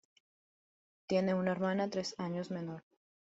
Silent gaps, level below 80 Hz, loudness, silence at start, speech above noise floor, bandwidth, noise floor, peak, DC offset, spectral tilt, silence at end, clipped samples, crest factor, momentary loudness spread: none; -76 dBFS; -36 LUFS; 1.1 s; over 55 dB; 8 kHz; under -90 dBFS; -20 dBFS; under 0.1%; -5.5 dB/octave; 0.55 s; under 0.1%; 18 dB; 10 LU